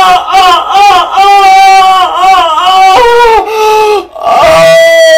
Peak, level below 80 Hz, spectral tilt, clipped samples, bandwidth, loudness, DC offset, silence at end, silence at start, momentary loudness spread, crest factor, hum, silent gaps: 0 dBFS; -34 dBFS; -2 dB/octave; 30%; 19.5 kHz; -3 LUFS; under 0.1%; 0 s; 0 s; 5 LU; 4 dB; none; none